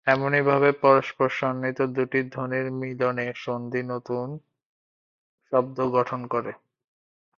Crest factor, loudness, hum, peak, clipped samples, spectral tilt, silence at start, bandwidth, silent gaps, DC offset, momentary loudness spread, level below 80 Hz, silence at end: 22 dB; -25 LUFS; none; -4 dBFS; under 0.1%; -7.5 dB/octave; 0.05 s; 7 kHz; 4.65-5.38 s; under 0.1%; 11 LU; -68 dBFS; 0.8 s